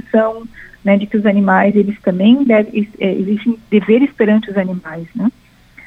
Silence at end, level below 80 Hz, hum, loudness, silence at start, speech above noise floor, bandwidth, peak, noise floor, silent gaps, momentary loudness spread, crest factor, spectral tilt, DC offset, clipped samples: 0.55 s; -52 dBFS; none; -14 LUFS; 0.15 s; 30 dB; 4 kHz; 0 dBFS; -43 dBFS; none; 10 LU; 14 dB; -9 dB/octave; under 0.1%; under 0.1%